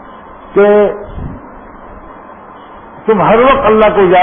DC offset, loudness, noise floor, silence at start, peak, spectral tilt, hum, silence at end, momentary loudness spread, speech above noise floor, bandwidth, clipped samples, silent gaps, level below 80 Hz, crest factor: under 0.1%; -9 LUFS; -33 dBFS; 0.05 s; 0 dBFS; -10 dB/octave; none; 0 s; 19 LU; 25 dB; 3.6 kHz; under 0.1%; none; -34 dBFS; 12 dB